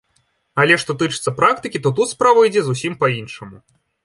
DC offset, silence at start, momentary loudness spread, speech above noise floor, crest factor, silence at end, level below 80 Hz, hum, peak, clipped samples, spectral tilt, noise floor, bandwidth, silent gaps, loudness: under 0.1%; 0.55 s; 12 LU; 47 dB; 18 dB; 0.5 s; -58 dBFS; none; 0 dBFS; under 0.1%; -4.5 dB/octave; -64 dBFS; 11.5 kHz; none; -17 LUFS